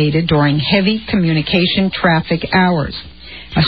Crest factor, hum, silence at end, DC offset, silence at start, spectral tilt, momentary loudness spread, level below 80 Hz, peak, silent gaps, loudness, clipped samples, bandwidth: 14 dB; none; 0 s; 0.7%; 0 s; -10 dB/octave; 10 LU; -38 dBFS; 0 dBFS; none; -14 LUFS; under 0.1%; 5 kHz